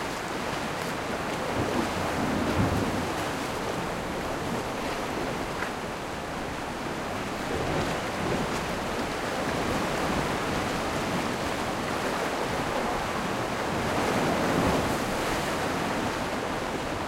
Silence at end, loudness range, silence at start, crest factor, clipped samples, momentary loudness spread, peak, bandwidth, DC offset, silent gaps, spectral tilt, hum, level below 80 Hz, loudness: 0 s; 4 LU; 0 s; 16 dB; under 0.1%; 6 LU; -12 dBFS; 16 kHz; under 0.1%; none; -4.5 dB/octave; none; -46 dBFS; -29 LUFS